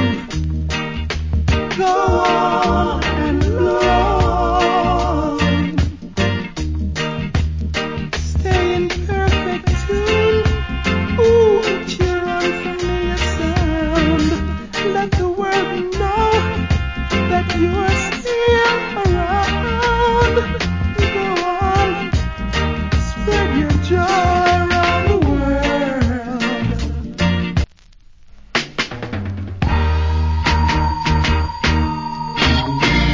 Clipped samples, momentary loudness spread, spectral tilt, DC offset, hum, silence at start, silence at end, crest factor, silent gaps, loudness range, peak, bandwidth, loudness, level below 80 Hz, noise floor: under 0.1%; 7 LU; -6 dB/octave; under 0.1%; none; 0 s; 0 s; 14 dB; none; 4 LU; -2 dBFS; 7.6 kHz; -17 LUFS; -24 dBFS; -44 dBFS